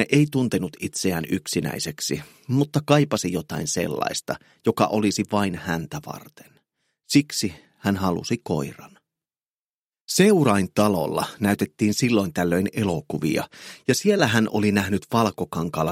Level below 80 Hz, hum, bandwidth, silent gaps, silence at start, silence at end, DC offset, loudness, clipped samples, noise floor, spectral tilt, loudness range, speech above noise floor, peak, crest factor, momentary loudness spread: -56 dBFS; none; 16.5 kHz; 9.50-9.90 s, 10.01-10.05 s; 0 s; 0 s; under 0.1%; -23 LUFS; under 0.1%; under -90 dBFS; -5 dB/octave; 5 LU; over 67 dB; -2 dBFS; 22 dB; 9 LU